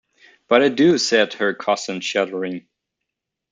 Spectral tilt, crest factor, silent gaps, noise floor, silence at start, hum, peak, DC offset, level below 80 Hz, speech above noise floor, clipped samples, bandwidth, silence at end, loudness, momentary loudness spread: -4 dB/octave; 18 dB; none; -81 dBFS; 0.5 s; none; -2 dBFS; under 0.1%; -66 dBFS; 63 dB; under 0.1%; 9.4 kHz; 0.95 s; -19 LUFS; 11 LU